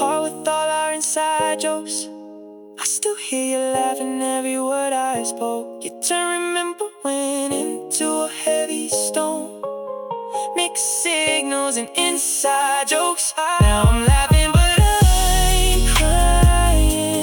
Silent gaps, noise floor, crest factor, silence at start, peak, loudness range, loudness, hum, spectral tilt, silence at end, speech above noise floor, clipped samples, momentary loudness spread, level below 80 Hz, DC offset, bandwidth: none; -39 dBFS; 14 dB; 0 s; -4 dBFS; 7 LU; -19 LUFS; none; -3.5 dB/octave; 0 s; 19 dB; under 0.1%; 11 LU; -24 dBFS; under 0.1%; 18 kHz